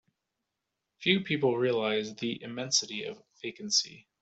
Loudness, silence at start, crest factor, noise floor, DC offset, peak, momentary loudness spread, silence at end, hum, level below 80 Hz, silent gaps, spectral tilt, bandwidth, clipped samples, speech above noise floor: -29 LUFS; 1 s; 20 dB; -85 dBFS; under 0.1%; -12 dBFS; 14 LU; 0.2 s; none; -74 dBFS; none; -3 dB/octave; 8.2 kHz; under 0.1%; 55 dB